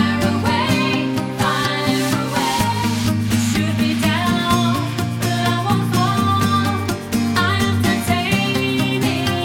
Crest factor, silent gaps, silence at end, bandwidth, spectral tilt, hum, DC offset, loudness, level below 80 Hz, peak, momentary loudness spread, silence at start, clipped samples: 14 dB; none; 0 s; 17.5 kHz; -5 dB/octave; none; under 0.1%; -18 LUFS; -42 dBFS; -4 dBFS; 3 LU; 0 s; under 0.1%